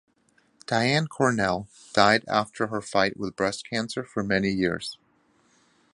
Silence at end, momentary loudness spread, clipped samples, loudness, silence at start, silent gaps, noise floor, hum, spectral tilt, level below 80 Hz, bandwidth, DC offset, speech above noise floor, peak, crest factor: 1 s; 10 LU; under 0.1%; -25 LUFS; 0.7 s; none; -65 dBFS; none; -4.5 dB/octave; -56 dBFS; 11.5 kHz; under 0.1%; 40 dB; -2 dBFS; 26 dB